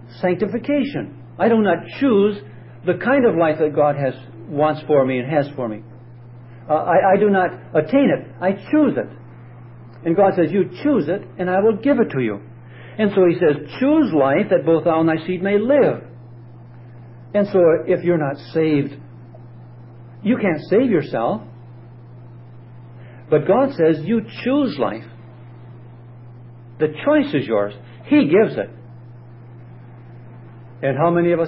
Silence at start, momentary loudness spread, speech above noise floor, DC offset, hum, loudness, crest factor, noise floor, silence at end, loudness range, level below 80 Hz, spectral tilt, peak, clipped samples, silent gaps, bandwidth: 0 s; 12 LU; 22 dB; under 0.1%; none; -18 LUFS; 14 dB; -40 dBFS; 0 s; 5 LU; -60 dBFS; -12 dB/octave; -4 dBFS; under 0.1%; none; 5.8 kHz